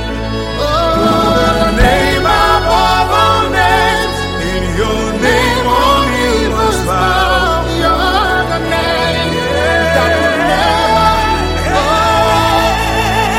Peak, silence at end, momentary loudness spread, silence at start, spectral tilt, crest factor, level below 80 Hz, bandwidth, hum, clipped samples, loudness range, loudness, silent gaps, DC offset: 0 dBFS; 0 s; 5 LU; 0 s; -4.5 dB/octave; 12 dB; -22 dBFS; 16.5 kHz; none; under 0.1%; 2 LU; -12 LUFS; none; under 0.1%